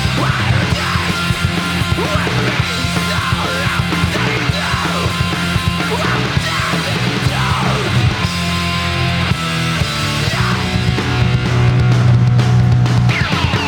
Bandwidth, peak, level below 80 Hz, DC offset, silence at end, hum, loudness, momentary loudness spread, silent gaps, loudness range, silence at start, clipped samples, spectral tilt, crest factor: 18.5 kHz; -2 dBFS; -30 dBFS; under 0.1%; 0 s; none; -15 LUFS; 4 LU; none; 2 LU; 0 s; under 0.1%; -5 dB/octave; 12 dB